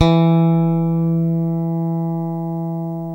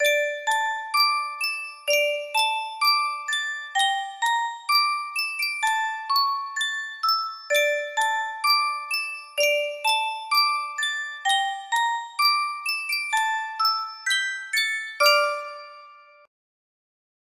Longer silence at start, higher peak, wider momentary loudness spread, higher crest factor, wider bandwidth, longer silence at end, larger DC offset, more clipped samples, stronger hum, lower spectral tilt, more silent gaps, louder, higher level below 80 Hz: about the same, 0 s vs 0 s; first, 0 dBFS vs -6 dBFS; first, 10 LU vs 6 LU; about the same, 18 dB vs 20 dB; second, 5.8 kHz vs 16 kHz; second, 0 s vs 1.25 s; neither; neither; first, 60 Hz at -70 dBFS vs none; first, -9.5 dB/octave vs 3.5 dB/octave; neither; first, -18 LUFS vs -23 LUFS; first, -46 dBFS vs -80 dBFS